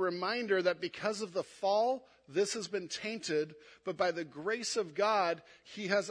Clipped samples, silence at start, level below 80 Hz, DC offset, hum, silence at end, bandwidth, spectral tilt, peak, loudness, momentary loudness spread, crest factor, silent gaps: under 0.1%; 0 s; -80 dBFS; under 0.1%; none; 0 s; 10.5 kHz; -3.5 dB/octave; -16 dBFS; -34 LUFS; 10 LU; 18 dB; none